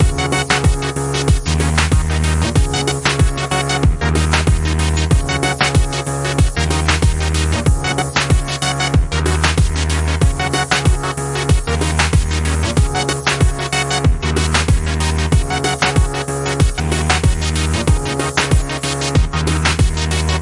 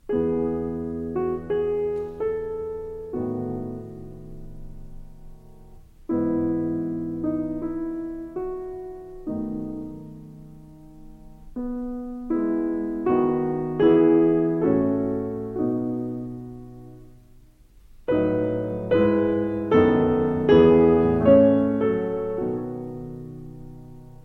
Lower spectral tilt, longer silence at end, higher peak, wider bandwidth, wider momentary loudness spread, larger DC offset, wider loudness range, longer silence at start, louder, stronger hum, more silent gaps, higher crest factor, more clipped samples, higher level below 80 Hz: second, -4.5 dB/octave vs -9.5 dB/octave; about the same, 0 s vs 0.05 s; first, 0 dBFS vs -4 dBFS; first, 11.5 kHz vs 5.8 kHz; second, 3 LU vs 22 LU; neither; second, 1 LU vs 15 LU; about the same, 0 s vs 0.1 s; first, -16 LUFS vs -23 LUFS; neither; neither; about the same, 16 dB vs 20 dB; neither; first, -20 dBFS vs -46 dBFS